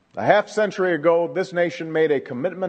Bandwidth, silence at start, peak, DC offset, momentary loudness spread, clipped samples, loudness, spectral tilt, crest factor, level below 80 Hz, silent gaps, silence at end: 8.8 kHz; 0.15 s; 0 dBFS; under 0.1%; 5 LU; under 0.1%; -21 LUFS; -6 dB/octave; 20 dB; -72 dBFS; none; 0 s